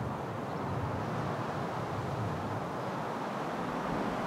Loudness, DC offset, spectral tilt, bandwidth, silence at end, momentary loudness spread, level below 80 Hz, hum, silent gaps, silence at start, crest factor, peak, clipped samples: -36 LUFS; under 0.1%; -7 dB/octave; 16 kHz; 0 s; 2 LU; -58 dBFS; none; none; 0 s; 12 dB; -22 dBFS; under 0.1%